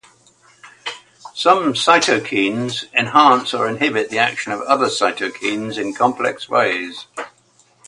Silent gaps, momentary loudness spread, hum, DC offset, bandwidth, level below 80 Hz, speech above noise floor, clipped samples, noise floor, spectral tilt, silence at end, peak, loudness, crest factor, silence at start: none; 17 LU; none; under 0.1%; 11.5 kHz; -64 dBFS; 38 dB; under 0.1%; -56 dBFS; -3.5 dB/octave; 0.6 s; 0 dBFS; -17 LUFS; 18 dB; 0.65 s